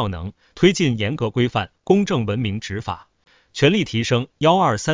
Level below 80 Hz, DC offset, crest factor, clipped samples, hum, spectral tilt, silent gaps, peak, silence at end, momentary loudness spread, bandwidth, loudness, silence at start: -44 dBFS; under 0.1%; 18 dB; under 0.1%; none; -5.5 dB/octave; none; -2 dBFS; 0 s; 14 LU; 7.6 kHz; -20 LUFS; 0 s